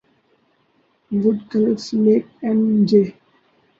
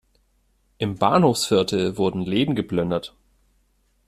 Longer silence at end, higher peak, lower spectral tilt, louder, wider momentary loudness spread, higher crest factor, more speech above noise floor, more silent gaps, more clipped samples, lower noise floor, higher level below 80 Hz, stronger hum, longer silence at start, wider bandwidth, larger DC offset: second, 0.7 s vs 1 s; about the same, -2 dBFS vs -4 dBFS; first, -8 dB/octave vs -5.5 dB/octave; first, -18 LUFS vs -22 LUFS; second, 6 LU vs 11 LU; about the same, 16 dB vs 20 dB; about the same, 45 dB vs 44 dB; neither; neither; about the same, -62 dBFS vs -65 dBFS; second, -64 dBFS vs -54 dBFS; neither; first, 1.1 s vs 0.8 s; second, 7.4 kHz vs 14.5 kHz; neither